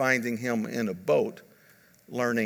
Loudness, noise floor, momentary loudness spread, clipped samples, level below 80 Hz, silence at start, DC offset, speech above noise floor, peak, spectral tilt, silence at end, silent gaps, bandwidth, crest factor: -28 LUFS; -59 dBFS; 7 LU; under 0.1%; -78 dBFS; 0 s; under 0.1%; 31 dB; -10 dBFS; -5.5 dB/octave; 0 s; none; 19.5 kHz; 20 dB